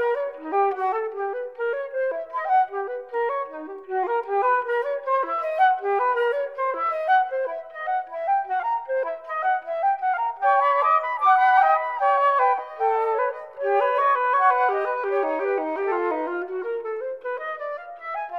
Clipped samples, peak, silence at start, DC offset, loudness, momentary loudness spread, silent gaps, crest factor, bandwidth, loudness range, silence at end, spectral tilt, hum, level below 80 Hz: under 0.1%; -8 dBFS; 0 s; under 0.1%; -23 LUFS; 11 LU; none; 16 dB; 5.6 kHz; 6 LU; 0 s; -3.5 dB/octave; none; -78 dBFS